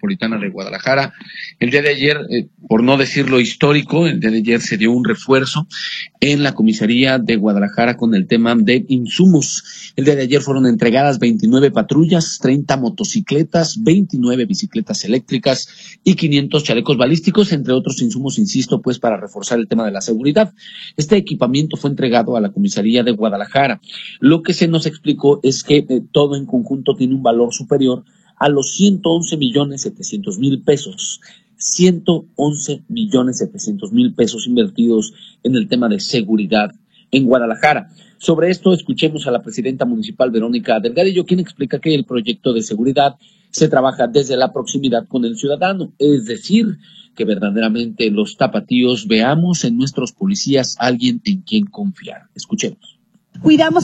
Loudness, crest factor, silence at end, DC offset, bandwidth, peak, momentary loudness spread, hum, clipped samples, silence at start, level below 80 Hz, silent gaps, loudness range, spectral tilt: -15 LUFS; 16 dB; 0 s; under 0.1%; 8.8 kHz; 0 dBFS; 8 LU; none; under 0.1%; 0.05 s; -56 dBFS; none; 3 LU; -5 dB/octave